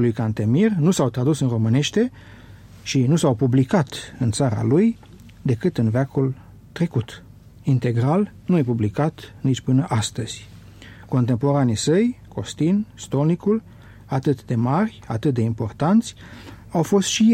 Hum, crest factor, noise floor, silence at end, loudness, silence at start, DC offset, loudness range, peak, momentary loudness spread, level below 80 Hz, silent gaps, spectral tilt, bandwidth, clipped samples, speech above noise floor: none; 14 dB; -42 dBFS; 0 s; -21 LUFS; 0 s; under 0.1%; 3 LU; -6 dBFS; 11 LU; -50 dBFS; none; -6.5 dB/octave; 13.5 kHz; under 0.1%; 22 dB